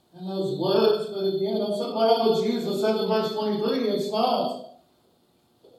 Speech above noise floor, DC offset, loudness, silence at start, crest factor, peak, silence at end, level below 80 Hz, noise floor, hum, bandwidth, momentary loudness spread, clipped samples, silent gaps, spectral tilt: 40 dB; under 0.1%; -25 LUFS; 0.15 s; 18 dB; -8 dBFS; 1.05 s; -82 dBFS; -64 dBFS; none; 13.5 kHz; 7 LU; under 0.1%; none; -6 dB/octave